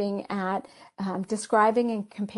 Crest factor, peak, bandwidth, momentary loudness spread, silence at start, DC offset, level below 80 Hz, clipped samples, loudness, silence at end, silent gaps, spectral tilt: 18 dB; -8 dBFS; 11.5 kHz; 11 LU; 0 s; under 0.1%; -70 dBFS; under 0.1%; -27 LUFS; 0 s; none; -5.5 dB/octave